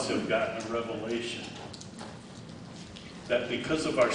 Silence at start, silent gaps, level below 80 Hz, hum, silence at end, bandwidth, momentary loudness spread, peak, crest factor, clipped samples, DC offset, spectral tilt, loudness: 0 s; none; -60 dBFS; none; 0 s; 10.5 kHz; 16 LU; -12 dBFS; 20 dB; under 0.1%; under 0.1%; -4.5 dB/octave; -32 LUFS